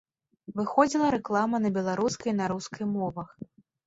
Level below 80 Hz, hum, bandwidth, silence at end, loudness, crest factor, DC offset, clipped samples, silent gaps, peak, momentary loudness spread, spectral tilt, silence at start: -64 dBFS; none; 8 kHz; 0.45 s; -28 LUFS; 22 dB; under 0.1%; under 0.1%; none; -8 dBFS; 16 LU; -5.5 dB/octave; 0.5 s